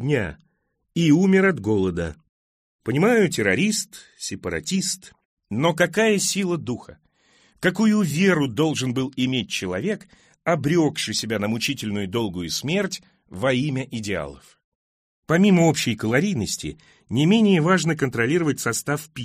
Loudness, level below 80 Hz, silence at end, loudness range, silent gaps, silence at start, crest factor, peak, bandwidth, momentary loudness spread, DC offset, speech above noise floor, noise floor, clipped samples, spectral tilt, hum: -22 LUFS; -54 dBFS; 0 s; 4 LU; 2.29-2.79 s, 5.25-5.37 s, 14.64-15.23 s; 0 s; 18 dB; -4 dBFS; 15.5 kHz; 13 LU; under 0.1%; 49 dB; -71 dBFS; under 0.1%; -5 dB/octave; none